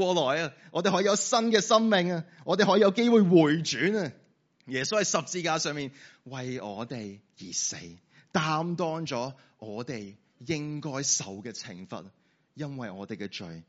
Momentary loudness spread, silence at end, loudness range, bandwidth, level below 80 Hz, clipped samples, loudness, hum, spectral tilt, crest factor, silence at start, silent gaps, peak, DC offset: 19 LU; 0.05 s; 10 LU; 8 kHz; -72 dBFS; under 0.1%; -27 LUFS; none; -4 dB/octave; 22 dB; 0 s; none; -6 dBFS; under 0.1%